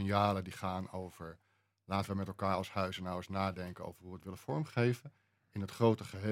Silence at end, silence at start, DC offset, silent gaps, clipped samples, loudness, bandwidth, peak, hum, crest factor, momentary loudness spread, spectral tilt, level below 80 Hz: 0 s; 0 s; under 0.1%; none; under 0.1%; -37 LUFS; 16 kHz; -14 dBFS; none; 22 dB; 16 LU; -7 dB/octave; -72 dBFS